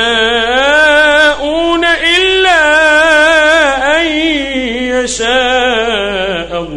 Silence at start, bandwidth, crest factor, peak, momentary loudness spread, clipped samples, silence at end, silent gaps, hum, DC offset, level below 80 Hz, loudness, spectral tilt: 0 s; 11.5 kHz; 10 dB; 0 dBFS; 8 LU; 0.2%; 0 s; none; none; under 0.1%; -34 dBFS; -9 LUFS; -2 dB/octave